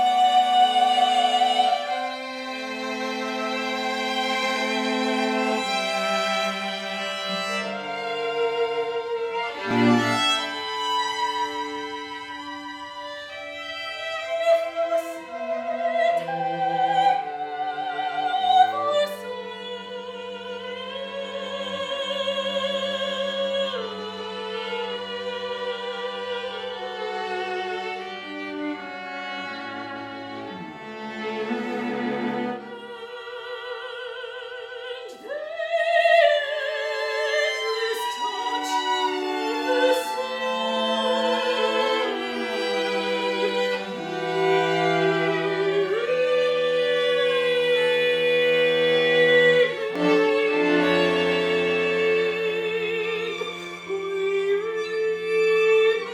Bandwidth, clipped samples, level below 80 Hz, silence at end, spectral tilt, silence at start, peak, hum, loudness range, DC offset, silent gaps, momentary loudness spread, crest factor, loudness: 15.5 kHz; under 0.1%; -70 dBFS; 0 s; -3.5 dB/octave; 0 s; -6 dBFS; none; 10 LU; under 0.1%; none; 14 LU; 18 dB; -24 LUFS